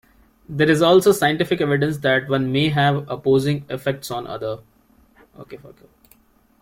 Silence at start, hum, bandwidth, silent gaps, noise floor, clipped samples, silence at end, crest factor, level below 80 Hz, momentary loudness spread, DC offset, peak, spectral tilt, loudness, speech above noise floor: 0.5 s; none; 16.5 kHz; none; -56 dBFS; under 0.1%; 0.95 s; 16 dB; -54 dBFS; 17 LU; under 0.1%; -4 dBFS; -5.5 dB/octave; -19 LUFS; 37 dB